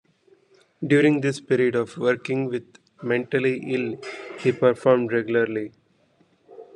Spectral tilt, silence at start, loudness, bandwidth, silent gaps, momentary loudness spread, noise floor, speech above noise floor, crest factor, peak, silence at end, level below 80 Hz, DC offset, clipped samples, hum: -7 dB/octave; 0.8 s; -23 LUFS; 10.5 kHz; none; 14 LU; -62 dBFS; 40 dB; 20 dB; -4 dBFS; 0.15 s; -70 dBFS; under 0.1%; under 0.1%; none